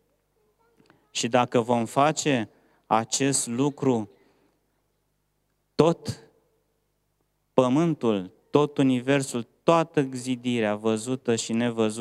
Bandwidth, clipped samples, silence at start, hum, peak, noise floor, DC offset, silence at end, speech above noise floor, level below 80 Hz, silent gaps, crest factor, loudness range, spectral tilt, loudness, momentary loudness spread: 14 kHz; under 0.1%; 1.15 s; 50 Hz at -60 dBFS; -2 dBFS; -73 dBFS; under 0.1%; 0 s; 49 dB; -66 dBFS; none; 24 dB; 5 LU; -5 dB/octave; -25 LUFS; 8 LU